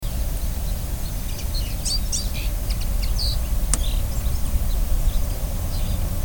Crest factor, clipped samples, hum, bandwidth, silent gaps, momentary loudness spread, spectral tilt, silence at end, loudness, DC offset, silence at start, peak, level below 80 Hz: 22 dB; under 0.1%; none; 19.5 kHz; none; 5 LU; -4 dB/octave; 0 s; -26 LUFS; 1%; 0 s; 0 dBFS; -22 dBFS